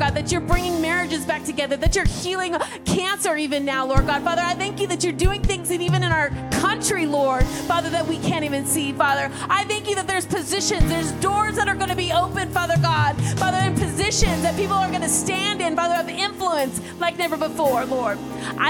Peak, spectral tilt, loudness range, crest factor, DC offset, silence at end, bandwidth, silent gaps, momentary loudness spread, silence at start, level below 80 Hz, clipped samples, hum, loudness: -4 dBFS; -4 dB/octave; 2 LU; 18 dB; under 0.1%; 0 s; 17.5 kHz; none; 4 LU; 0 s; -32 dBFS; under 0.1%; none; -22 LUFS